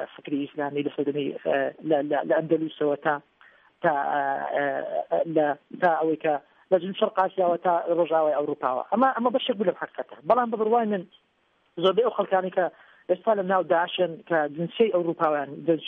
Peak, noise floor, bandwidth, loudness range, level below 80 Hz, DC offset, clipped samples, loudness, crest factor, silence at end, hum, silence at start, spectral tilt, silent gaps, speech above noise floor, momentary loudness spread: -8 dBFS; -68 dBFS; 4.3 kHz; 2 LU; -76 dBFS; under 0.1%; under 0.1%; -25 LUFS; 18 dB; 0 s; none; 0 s; -8.5 dB/octave; none; 43 dB; 7 LU